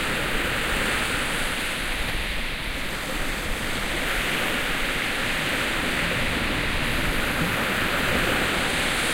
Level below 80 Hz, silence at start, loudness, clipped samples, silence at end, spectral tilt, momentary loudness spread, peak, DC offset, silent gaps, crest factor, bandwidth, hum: -34 dBFS; 0 s; -24 LUFS; under 0.1%; 0 s; -3 dB/octave; 5 LU; -10 dBFS; under 0.1%; none; 14 dB; 16 kHz; none